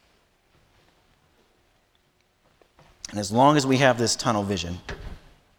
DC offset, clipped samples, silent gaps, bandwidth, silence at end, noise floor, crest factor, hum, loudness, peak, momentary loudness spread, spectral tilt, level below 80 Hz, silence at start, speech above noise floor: under 0.1%; under 0.1%; none; 19.5 kHz; 0.4 s; -66 dBFS; 22 dB; none; -22 LUFS; -4 dBFS; 21 LU; -4.5 dB/octave; -50 dBFS; 3.1 s; 44 dB